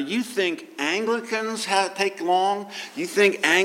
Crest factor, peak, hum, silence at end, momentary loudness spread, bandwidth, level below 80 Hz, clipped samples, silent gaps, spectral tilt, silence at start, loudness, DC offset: 18 dB; -6 dBFS; none; 0 s; 8 LU; 16.5 kHz; -82 dBFS; under 0.1%; none; -2.5 dB/octave; 0 s; -23 LUFS; under 0.1%